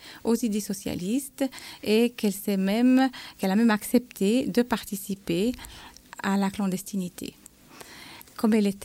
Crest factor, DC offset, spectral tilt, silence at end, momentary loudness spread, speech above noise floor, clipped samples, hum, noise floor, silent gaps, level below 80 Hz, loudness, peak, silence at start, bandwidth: 16 dB; under 0.1%; -5.5 dB/octave; 0 s; 18 LU; 23 dB; under 0.1%; none; -49 dBFS; none; -58 dBFS; -26 LUFS; -10 dBFS; 0 s; 16.5 kHz